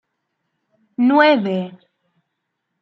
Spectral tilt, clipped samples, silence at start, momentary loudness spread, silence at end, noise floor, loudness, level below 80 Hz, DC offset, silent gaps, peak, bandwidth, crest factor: -7.5 dB/octave; under 0.1%; 1 s; 20 LU; 1.05 s; -76 dBFS; -16 LUFS; -76 dBFS; under 0.1%; none; -2 dBFS; 6 kHz; 18 dB